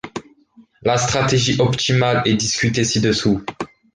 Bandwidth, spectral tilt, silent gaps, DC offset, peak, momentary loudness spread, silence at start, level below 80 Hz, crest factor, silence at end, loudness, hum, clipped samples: 10 kHz; -4.5 dB/octave; none; under 0.1%; -4 dBFS; 13 LU; 0.05 s; -46 dBFS; 16 dB; 0.3 s; -17 LUFS; none; under 0.1%